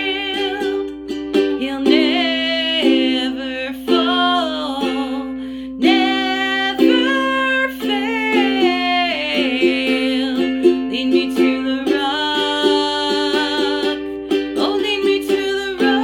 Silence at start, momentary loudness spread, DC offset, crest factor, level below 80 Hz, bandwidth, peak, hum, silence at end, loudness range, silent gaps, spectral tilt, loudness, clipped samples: 0 s; 7 LU; under 0.1%; 16 dB; -50 dBFS; 17 kHz; 0 dBFS; none; 0 s; 2 LU; none; -3.5 dB/octave; -17 LUFS; under 0.1%